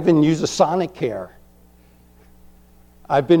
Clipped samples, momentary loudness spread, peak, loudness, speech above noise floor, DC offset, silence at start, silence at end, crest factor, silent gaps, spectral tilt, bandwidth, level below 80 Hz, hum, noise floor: under 0.1%; 13 LU; -2 dBFS; -20 LUFS; 33 dB; under 0.1%; 0 s; 0 s; 18 dB; none; -6 dB/octave; 11.5 kHz; -52 dBFS; 60 Hz at -50 dBFS; -51 dBFS